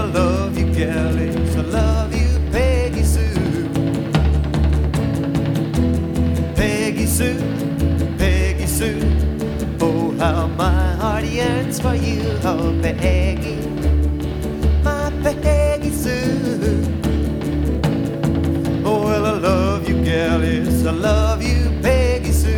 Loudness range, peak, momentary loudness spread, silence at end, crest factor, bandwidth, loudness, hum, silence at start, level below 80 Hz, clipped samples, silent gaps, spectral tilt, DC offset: 2 LU; -4 dBFS; 3 LU; 0 s; 14 dB; 16.5 kHz; -19 LUFS; none; 0 s; -22 dBFS; under 0.1%; none; -6.5 dB/octave; under 0.1%